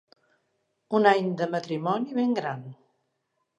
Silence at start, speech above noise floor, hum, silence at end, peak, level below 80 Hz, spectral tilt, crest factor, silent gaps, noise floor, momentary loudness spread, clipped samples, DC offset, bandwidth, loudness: 0.9 s; 52 dB; none; 0.85 s; -6 dBFS; -82 dBFS; -7 dB/octave; 22 dB; none; -77 dBFS; 13 LU; under 0.1%; under 0.1%; 8.2 kHz; -26 LUFS